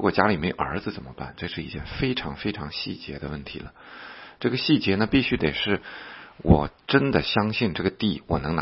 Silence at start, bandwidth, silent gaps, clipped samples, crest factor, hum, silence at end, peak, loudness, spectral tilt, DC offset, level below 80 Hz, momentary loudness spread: 0 s; 5.8 kHz; none; under 0.1%; 24 dB; none; 0 s; 0 dBFS; -25 LUFS; -10 dB/octave; under 0.1%; -42 dBFS; 17 LU